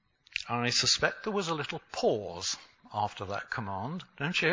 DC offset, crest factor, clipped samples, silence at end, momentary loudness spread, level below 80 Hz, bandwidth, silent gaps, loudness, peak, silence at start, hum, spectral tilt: under 0.1%; 22 dB; under 0.1%; 0 s; 12 LU; -62 dBFS; 7.8 kHz; none; -31 LUFS; -10 dBFS; 0.35 s; none; -3 dB/octave